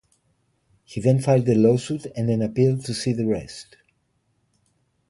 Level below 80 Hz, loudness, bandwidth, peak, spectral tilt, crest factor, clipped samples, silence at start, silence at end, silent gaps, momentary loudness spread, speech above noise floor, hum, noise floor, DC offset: -56 dBFS; -22 LUFS; 11.5 kHz; -4 dBFS; -7 dB/octave; 18 dB; under 0.1%; 0.9 s; 1.45 s; none; 12 LU; 48 dB; none; -69 dBFS; under 0.1%